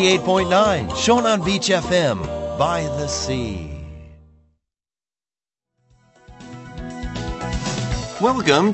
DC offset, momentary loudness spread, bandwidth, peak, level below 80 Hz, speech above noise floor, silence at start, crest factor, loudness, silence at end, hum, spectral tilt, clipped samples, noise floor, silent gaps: under 0.1%; 18 LU; 8.4 kHz; -2 dBFS; -38 dBFS; over 72 dB; 0 s; 20 dB; -20 LUFS; 0 s; none; -4.5 dB/octave; under 0.1%; under -90 dBFS; none